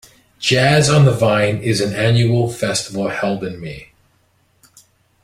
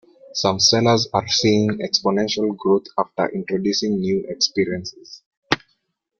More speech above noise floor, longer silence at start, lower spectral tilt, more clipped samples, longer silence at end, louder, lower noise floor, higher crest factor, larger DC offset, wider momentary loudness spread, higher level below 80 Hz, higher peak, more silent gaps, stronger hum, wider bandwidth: second, 44 dB vs 50 dB; about the same, 0.4 s vs 0.3 s; about the same, -5 dB/octave vs -4 dB/octave; neither; first, 1.4 s vs 0.65 s; first, -16 LUFS vs -20 LUFS; second, -59 dBFS vs -70 dBFS; about the same, 16 dB vs 20 dB; neither; first, 13 LU vs 9 LU; first, -48 dBFS vs -58 dBFS; about the same, -2 dBFS vs 0 dBFS; second, none vs 5.26-5.31 s, 5.37-5.42 s; neither; first, 15 kHz vs 7.2 kHz